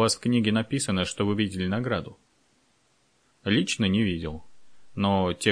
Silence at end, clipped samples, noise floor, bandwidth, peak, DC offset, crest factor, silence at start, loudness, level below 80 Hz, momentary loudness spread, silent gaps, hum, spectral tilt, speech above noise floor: 0 s; under 0.1%; -67 dBFS; 10.5 kHz; -6 dBFS; under 0.1%; 20 dB; 0 s; -26 LUFS; -54 dBFS; 12 LU; none; none; -5 dB/octave; 42 dB